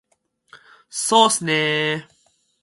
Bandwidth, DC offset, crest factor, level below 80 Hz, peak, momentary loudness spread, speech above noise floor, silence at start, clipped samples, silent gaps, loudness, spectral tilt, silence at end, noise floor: 12 kHz; under 0.1%; 22 dB; -72 dBFS; 0 dBFS; 13 LU; 46 dB; 0.55 s; under 0.1%; none; -18 LUFS; -2.5 dB/octave; 0.6 s; -65 dBFS